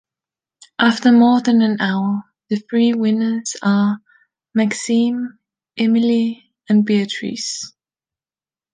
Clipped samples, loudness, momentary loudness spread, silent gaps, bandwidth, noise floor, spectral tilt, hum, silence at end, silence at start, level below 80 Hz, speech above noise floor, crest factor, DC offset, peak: under 0.1%; -17 LUFS; 14 LU; none; 9.6 kHz; under -90 dBFS; -5 dB/octave; none; 1.05 s; 0.8 s; -68 dBFS; over 74 dB; 16 dB; under 0.1%; -2 dBFS